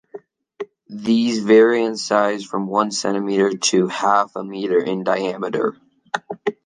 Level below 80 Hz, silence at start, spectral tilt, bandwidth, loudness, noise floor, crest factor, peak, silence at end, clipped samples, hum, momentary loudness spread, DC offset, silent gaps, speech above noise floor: -68 dBFS; 0.15 s; -4 dB/octave; 10 kHz; -19 LUFS; -41 dBFS; 18 dB; -2 dBFS; 0.15 s; under 0.1%; none; 14 LU; under 0.1%; none; 23 dB